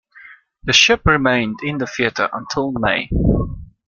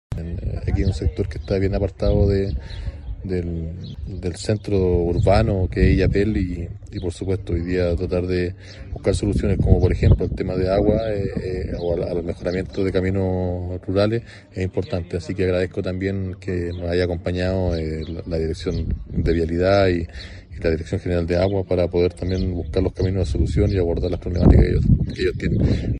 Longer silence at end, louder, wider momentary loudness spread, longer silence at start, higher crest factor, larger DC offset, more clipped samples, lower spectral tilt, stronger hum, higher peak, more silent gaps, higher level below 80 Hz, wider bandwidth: first, 0.25 s vs 0 s; first, -17 LUFS vs -22 LUFS; about the same, 11 LU vs 11 LU; about the same, 0.15 s vs 0.1 s; about the same, 18 dB vs 20 dB; neither; neither; second, -4 dB/octave vs -8 dB/octave; neither; about the same, 0 dBFS vs 0 dBFS; neither; about the same, -30 dBFS vs -28 dBFS; second, 7.4 kHz vs 10.5 kHz